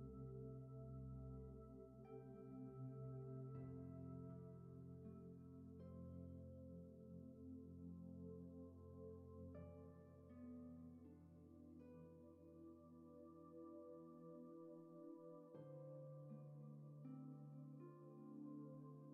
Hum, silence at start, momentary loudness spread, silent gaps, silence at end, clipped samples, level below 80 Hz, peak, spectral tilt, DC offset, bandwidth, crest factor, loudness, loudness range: none; 0 s; 8 LU; none; 0 s; under 0.1%; -74 dBFS; -46 dBFS; -11 dB/octave; under 0.1%; 3.1 kHz; 14 dB; -59 LUFS; 6 LU